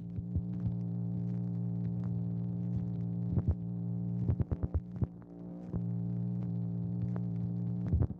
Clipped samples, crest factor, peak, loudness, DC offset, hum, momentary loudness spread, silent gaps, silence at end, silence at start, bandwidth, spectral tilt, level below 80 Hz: under 0.1%; 16 dB; -20 dBFS; -36 LUFS; under 0.1%; none; 4 LU; none; 0 s; 0 s; 2.3 kHz; -12.5 dB/octave; -46 dBFS